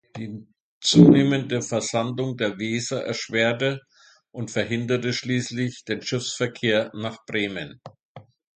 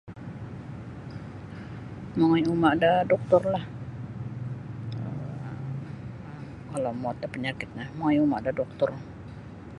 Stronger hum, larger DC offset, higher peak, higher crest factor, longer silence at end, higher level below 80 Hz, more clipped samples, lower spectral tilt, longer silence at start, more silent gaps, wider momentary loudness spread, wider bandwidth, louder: neither; neither; first, 0 dBFS vs -6 dBFS; about the same, 22 dB vs 22 dB; first, 0.35 s vs 0 s; second, -60 dBFS vs -54 dBFS; neither; second, -5 dB/octave vs -8 dB/octave; about the same, 0.15 s vs 0.05 s; first, 0.60-0.81 s, 8.05-8.15 s vs none; about the same, 18 LU vs 18 LU; second, 9.4 kHz vs 11 kHz; first, -23 LUFS vs -27 LUFS